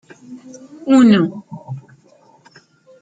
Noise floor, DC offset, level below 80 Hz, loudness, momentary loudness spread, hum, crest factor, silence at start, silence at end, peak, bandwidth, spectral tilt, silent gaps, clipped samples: -51 dBFS; under 0.1%; -60 dBFS; -13 LUFS; 27 LU; none; 16 dB; 0.3 s; 1.2 s; -2 dBFS; 9.2 kHz; -6.5 dB/octave; none; under 0.1%